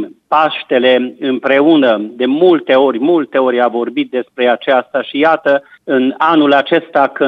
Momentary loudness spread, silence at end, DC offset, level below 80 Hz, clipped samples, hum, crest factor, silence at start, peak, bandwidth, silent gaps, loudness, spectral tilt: 7 LU; 0 s; under 0.1%; -66 dBFS; under 0.1%; none; 12 dB; 0 s; 0 dBFS; 5.8 kHz; none; -12 LUFS; -7 dB/octave